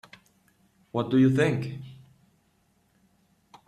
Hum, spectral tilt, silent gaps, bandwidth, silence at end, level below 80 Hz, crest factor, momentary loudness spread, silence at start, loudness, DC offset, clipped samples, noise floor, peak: none; -7.5 dB/octave; none; 10.5 kHz; 1.75 s; -64 dBFS; 20 dB; 20 LU; 0.95 s; -25 LUFS; under 0.1%; under 0.1%; -68 dBFS; -10 dBFS